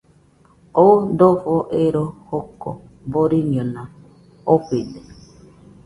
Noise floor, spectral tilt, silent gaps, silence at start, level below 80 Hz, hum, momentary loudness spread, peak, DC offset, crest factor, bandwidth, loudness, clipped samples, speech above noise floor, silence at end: -53 dBFS; -9.5 dB/octave; none; 0.75 s; -52 dBFS; none; 20 LU; 0 dBFS; under 0.1%; 20 dB; 11.5 kHz; -18 LUFS; under 0.1%; 36 dB; 0.75 s